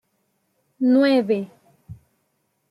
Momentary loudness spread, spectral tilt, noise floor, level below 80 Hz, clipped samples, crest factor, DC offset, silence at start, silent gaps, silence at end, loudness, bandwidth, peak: 10 LU; -7 dB/octave; -71 dBFS; -66 dBFS; under 0.1%; 16 dB; under 0.1%; 0.8 s; none; 0.75 s; -19 LUFS; 10.5 kHz; -8 dBFS